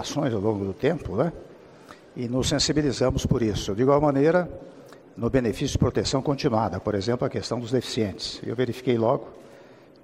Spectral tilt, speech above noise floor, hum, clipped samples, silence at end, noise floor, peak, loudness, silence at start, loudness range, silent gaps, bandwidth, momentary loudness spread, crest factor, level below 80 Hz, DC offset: -5.5 dB/octave; 25 dB; none; under 0.1%; 0.3 s; -49 dBFS; -6 dBFS; -25 LUFS; 0 s; 3 LU; none; 15 kHz; 10 LU; 18 dB; -44 dBFS; under 0.1%